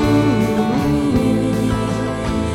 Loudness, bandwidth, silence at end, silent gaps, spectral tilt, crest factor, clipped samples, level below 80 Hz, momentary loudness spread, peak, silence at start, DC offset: -17 LUFS; 16.5 kHz; 0 s; none; -7 dB/octave; 12 dB; under 0.1%; -32 dBFS; 6 LU; -4 dBFS; 0 s; 0.1%